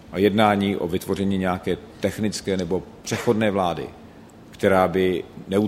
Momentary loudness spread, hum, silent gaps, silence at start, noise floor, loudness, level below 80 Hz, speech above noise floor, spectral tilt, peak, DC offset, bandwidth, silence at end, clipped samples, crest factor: 10 LU; none; none; 0.05 s; -45 dBFS; -23 LUFS; -52 dBFS; 23 dB; -6 dB/octave; -2 dBFS; under 0.1%; 16 kHz; 0 s; under 0.1%; 22 dB